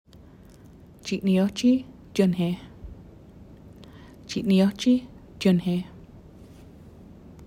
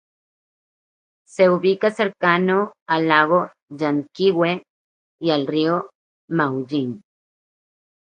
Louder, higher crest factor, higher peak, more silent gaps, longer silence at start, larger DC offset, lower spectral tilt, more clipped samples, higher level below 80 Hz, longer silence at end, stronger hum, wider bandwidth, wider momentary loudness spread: second, -24 LUFS vs -20 LUFS; about the same, 18 dB vs 22 dB; second, -8 dBFS vs 0 dBFS; second, none vs 2.82-2.86 s, 3.63-3.67 s, 4.70-5.19 s, 5.95-6.28 s; second, 1.05 s vs 1.4 s; neither; about the same, -6.5 dB/octave vs -7 dB/octave; neither; first, -52 dBFS vs -70 dBFS; second, 0 s vs 1.1 s; neither; first, 15 kHz vs 9.6 kHz; first, 24 LU vs 11 LU